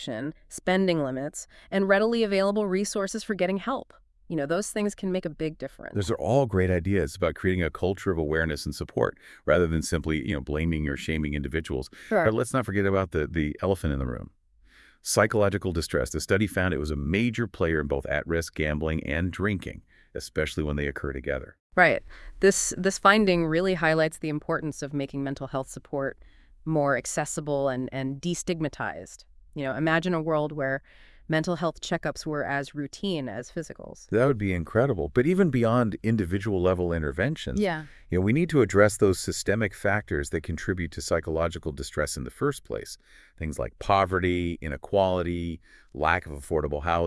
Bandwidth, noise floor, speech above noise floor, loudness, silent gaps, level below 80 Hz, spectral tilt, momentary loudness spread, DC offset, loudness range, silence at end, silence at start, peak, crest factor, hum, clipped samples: 12 kHz; -57 dBFS; 31 dB; -27 LUFS; 21.60-21.70 s; -44 dBFS; -5.5 dB/octave; 11 LU; under 0.1%; 5 LU; 0 s; 0 s; -4 dBFS; 22 dB; none; under 0.1%